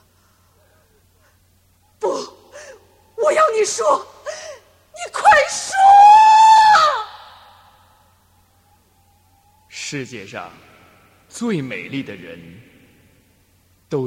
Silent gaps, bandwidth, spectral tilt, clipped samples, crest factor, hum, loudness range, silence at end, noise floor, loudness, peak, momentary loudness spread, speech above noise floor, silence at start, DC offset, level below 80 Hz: none; 12.5 kHz; -2.5 dB/octave; under 0.1%; 18 dB; none; 23 LU; 0 s; -57 dBFS; -13 LUFS; 0 dBFS; 27 LU; 33 dB; 2 s; under 0.1%; -60 dBFS